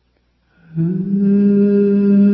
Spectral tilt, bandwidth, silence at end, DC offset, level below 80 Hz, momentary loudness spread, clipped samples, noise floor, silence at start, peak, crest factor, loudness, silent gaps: -13.5 dB/octave; 2.8 kHz; 0 s; under 0.1%; -56 dBFS; 8 LU; under 0.1%; -61 dBFS; 0.75 s; -4 dBFS; 10 dB; -14 LUFS; none